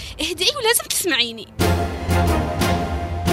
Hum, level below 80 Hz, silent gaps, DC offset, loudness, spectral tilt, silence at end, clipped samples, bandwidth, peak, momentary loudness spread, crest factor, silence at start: none; -34 dBFS; none; under 0.1%; -20 LUFS; -3.5 dB/octave; 0 s; under 0.1%; 16 kHz; -2 dBFS; 6 LU; 20 dB; 0 s